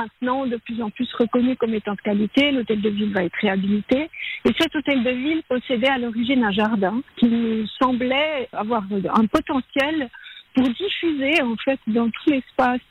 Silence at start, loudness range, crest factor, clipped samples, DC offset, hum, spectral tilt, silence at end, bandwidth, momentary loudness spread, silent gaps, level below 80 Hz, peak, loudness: 0 s; 1 LU; 14 dB; under 0.1%; under 0.1%; none; -6.5 dB/octave; 0.1 s; 11 kHz; 5 LU; none; -52 dBFS; -6 dBFS; -21 LUFS